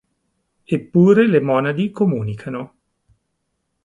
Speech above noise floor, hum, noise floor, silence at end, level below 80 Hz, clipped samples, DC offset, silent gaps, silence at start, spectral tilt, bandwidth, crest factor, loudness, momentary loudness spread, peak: 56 dB; none; -73 dBFS; 1.2 s; -58 dBFS; under 0.1%; under 0.1%; none; 0.7 s; -9 dB/octave; 7.6 kHz; 18 dB; -17 LUFS; 17 LU; -2 dBFS